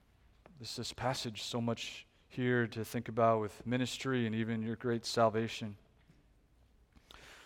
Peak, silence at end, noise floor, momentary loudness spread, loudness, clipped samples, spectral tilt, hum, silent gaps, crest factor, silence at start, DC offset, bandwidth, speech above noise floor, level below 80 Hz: -16 dBFS; 0 s; -67 dBFS; 15 LU; -35 LUFS; under 0.1%; -5.5 dB/octave; none; none; 22 dB; 0.55 s; under 0.1%; 16.5 kHz; 32 dB; -66 dBFS